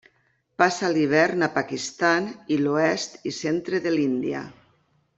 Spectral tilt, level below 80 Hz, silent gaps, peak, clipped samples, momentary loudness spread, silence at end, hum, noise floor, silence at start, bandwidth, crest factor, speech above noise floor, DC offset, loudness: -4.5 dB/octave; -68 dBFS; none; -4 dBFS; under 0.1%; 10 LU; 0.65 s; none; -67 dBFS; 0.6 s; 8 kHz; 22 dB; 44 dB; under 0.1%; -24 LUFS